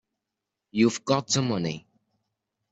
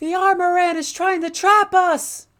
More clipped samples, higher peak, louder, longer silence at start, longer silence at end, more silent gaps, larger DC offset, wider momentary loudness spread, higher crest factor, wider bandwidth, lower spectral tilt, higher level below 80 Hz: neither; second, -8 dBFS vs -2 dBFS; second, -26 LUFS vs -17 LUFS; first, 0.75 s vs 0 s; first, 0.95 s vs 0.2 s; neither; neither; first, 10 LU vs 7 LU; about the same, 20 dB vs 16 dB; second, 8.2 kHz vs 18.5 kHz; first, -4.5 dB/octave vs -1 dB/octave; about the same, -66 dBFS vs -64 dBFS